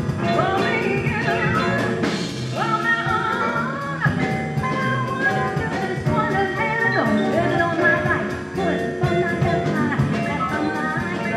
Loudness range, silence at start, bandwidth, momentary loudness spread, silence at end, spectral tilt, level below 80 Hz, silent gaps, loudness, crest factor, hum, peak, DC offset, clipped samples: 2 LU; 0 s; 13.5 kHz; 5 LU; 0 s; -6.5 dB/octave; -48 dBFS; none; -21 LUFS; 16 dB; none; -6 dBFS; under 0.1%; under 0.1%